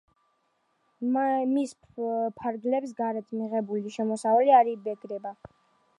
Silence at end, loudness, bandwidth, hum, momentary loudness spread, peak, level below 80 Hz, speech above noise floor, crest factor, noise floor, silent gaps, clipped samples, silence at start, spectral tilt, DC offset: 0.65 s; -27 LUFS; 11.5 kHz; none; 15 LU; -8 dBFS; -74 dBFS; 46 dB; 20 dB; -73 dBFS; none; under 0.1%; 1 s; -6 dB/octave; under 0.1%